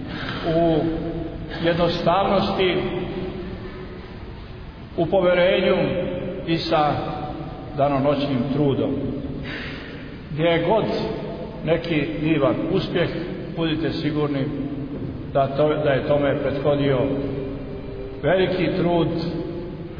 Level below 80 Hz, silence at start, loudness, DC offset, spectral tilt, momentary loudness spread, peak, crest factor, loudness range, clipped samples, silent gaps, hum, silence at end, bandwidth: -40 dBFS; 0 s; -22 LUFS; under 0.1%; -8.5 dB/octave; 13 LU; -6 dBFS; 16 dB; 2 LU; under 0.1%; none; none; 0 s; 5.4 kHz